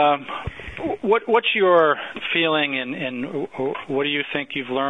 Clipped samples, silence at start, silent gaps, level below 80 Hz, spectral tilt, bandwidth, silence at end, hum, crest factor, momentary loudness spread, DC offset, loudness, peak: under 0.1%; 0 s; none; -50 dBFS; -6.5 dB/octave; 7.8 kHz; 0 s; none; 16 dB; 12 LU; 0.2%; -21 LUFS; -6 dBFS